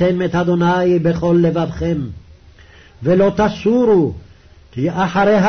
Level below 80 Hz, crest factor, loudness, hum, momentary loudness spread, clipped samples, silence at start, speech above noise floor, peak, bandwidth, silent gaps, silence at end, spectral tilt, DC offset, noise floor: -40 dBFS; 12 dB; -16 LUFS; none; 10 LU; under 0.1%; 0 s; 29 dB; -4 dBFS; 6.6 kHz; none; 0 s; -8 dB/octave; under 0.1%; -43 dBFS